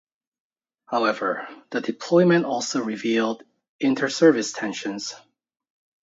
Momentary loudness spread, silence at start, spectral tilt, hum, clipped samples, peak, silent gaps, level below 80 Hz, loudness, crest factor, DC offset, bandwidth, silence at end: 13 LU; 0.9 s; -5 dB/octave; none; under 0.1%; -4 dBFS; 3.69-3.79 s; -76 dBFS; -23 LUFS; 20 dB; under 0.1%; 8 kHz; 0.85 s